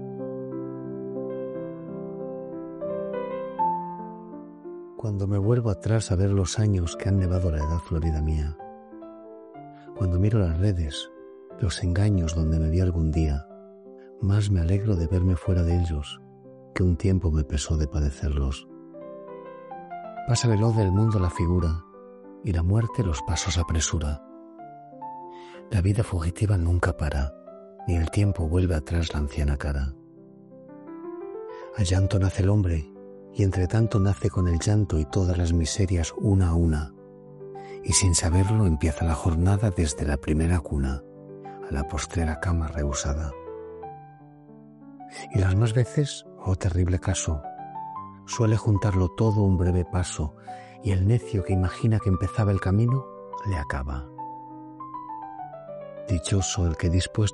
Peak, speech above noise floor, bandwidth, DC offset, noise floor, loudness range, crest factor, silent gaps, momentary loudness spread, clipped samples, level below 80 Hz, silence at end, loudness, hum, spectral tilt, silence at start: -6 dBFS; 25 dB; 11.5 kHz; under 0.1%; -49 dBFS; 6 LU; 20 dB; none; 18 LU; under 0.1%; -36 dBFS; 0 s; -25 LUFS; none; -6 dB/octave; 0 s